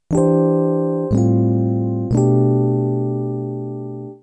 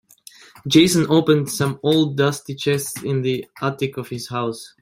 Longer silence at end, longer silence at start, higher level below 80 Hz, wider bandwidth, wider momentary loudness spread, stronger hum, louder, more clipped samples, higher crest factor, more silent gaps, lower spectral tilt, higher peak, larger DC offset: about the same, 0.05 s vs 0.15 s; second, 0.1 s vs 0.65 s; first, -42 dBFS vs -58 dBFS; second, 9.2 kHz vs 16.5 kHz; about the same, 11 LU vs 11 LU; neither; about the same, -18 LUFS vs -20 LUFS; neither; second, 14 dB vs 20 dB; neither; first, -10.5 dB/octave vs -5 dB/octave; second, -4 dBFS vs 0 dBFS; neither